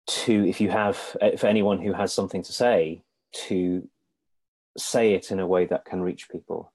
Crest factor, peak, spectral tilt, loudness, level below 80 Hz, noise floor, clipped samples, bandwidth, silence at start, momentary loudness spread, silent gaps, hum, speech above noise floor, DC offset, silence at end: 16 dB; -8 dBFS; -5 dB/octave; -24 LUFS; -64 dBFS; -77 dBFS; under 0.1%; 12.5 kHz; 0.05 s; 13 LU; 4.48-4.75 s; none; 53 dB; under 0.1%; 0.1 s